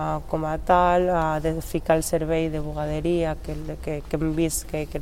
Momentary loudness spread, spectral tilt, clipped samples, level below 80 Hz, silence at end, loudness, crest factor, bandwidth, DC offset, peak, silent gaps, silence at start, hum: 11 LU; -5.5 dB/octave; under 0.1%; -36 dBFS; 0 s; -24 LUFS; 18 dB; 16.5 kHz; 0.4%; -6 dBFS; none; 0 s; none